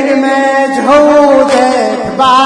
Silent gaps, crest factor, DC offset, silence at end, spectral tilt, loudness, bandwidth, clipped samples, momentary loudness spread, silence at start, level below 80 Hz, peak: none; 8 dB; under 0.1%; 0 s; -4 dB/octave; -8 LUFS; 10.5 kHz; 1%; 5 LU; 0 s; -44 dBFS; 0 dBFS